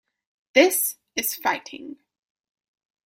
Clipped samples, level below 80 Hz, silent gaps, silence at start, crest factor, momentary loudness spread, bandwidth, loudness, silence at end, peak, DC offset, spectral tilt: under 0.1%; -72 dBFS; none; 0.55 s; 24 dB; 21 LU; 16.5 kHz; -22 LUFS; 1.1 s; -2 dBFS; under 0.1%; -0.5 dB/octave